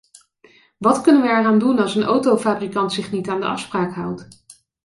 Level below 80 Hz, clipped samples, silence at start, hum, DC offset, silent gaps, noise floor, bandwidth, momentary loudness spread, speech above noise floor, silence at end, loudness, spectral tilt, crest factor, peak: -60 dBFS; under 0.1%; 0.8 s; none; under 0.1%; none; -53 dBFS; 11.5 kHz; 10 LU; 35 dB; 0.35 s; -18 LUFS; -5.5 dB/octave; 16 dB; -2 dBFS